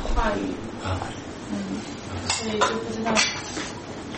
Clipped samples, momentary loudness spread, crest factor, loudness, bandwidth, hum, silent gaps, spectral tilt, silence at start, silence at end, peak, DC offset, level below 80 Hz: under 0.1%; 12 LU; 22 dB; -27 LUFS; 8.8 kHz; none; none; -3.5 dB/octave; 0 s; 0 s; -6 dBFS; under 0.1%; -36 dBFS